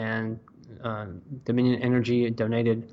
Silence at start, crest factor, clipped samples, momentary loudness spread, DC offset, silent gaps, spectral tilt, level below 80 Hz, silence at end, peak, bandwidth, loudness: 0 s; 14 dB; under 0.1%; 13 LU; under 0.1%; none; -8.5 dB/octave; -62 dBFS; 0 s; -12 dBFS; 7.4 kHz; -27 LUFS